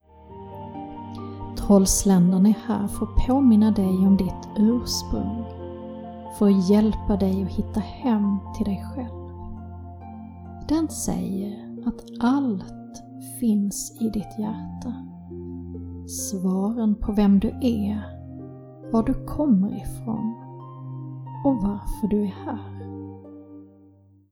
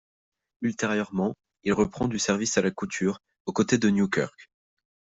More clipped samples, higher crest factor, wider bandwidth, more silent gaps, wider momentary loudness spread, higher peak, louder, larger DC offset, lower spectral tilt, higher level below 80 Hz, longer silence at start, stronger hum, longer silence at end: neither; about the same, 18 dB vs 20 dB; first, 17 kHz vs 8 kHz; second, none vs 3.40-3.45 s; first, 20 LU vs 9 LU; about the same, -6 dBFS vs -8 dBFS; first, -23 LUFS vs -27 LUFS; neither; first, -6.5 dB/octave vs -4.5 dB/octave; first, -38 dBFS vs -58 dBFS; second, 0.2 s vs 0.6 s; neither; about the same, 0.65 s vs 0.7 s